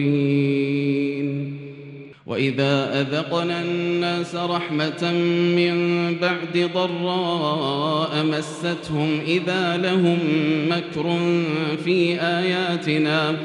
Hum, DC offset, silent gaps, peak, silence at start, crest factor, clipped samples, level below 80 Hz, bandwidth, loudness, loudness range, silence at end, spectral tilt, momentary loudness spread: none; under 0.1%; none; -6 dBFS; 0 s; 14 dB; under 0.1%; -66 dBFS; 11 kHz; -22 LUFS; 2 LU; 0 s; -6.5 dB/octave; 5 LU